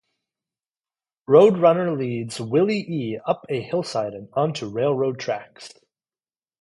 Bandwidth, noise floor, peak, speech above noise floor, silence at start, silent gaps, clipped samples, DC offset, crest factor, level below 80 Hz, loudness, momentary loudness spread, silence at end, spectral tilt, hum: 11.5 kHz; under -90 dBFS; -2 dBFS; over 69 dB; 1.3 s; none; under 0.1%; under 0.1%; 20 dB; -68 dBFS; -22 LUFS; 14 LU; 0.95 s; -6.5 dB/octave; none